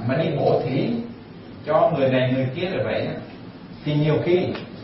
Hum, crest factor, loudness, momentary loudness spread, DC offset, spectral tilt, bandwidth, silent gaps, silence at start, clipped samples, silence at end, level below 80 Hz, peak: none; 16 dB; -22 LUFS; 18 LU; under 0.1%; -11.5 dB/octave; 5.8 kHz; none; 0 s; under 0.1%; 0 s; -54 dBFS; -6 dBFS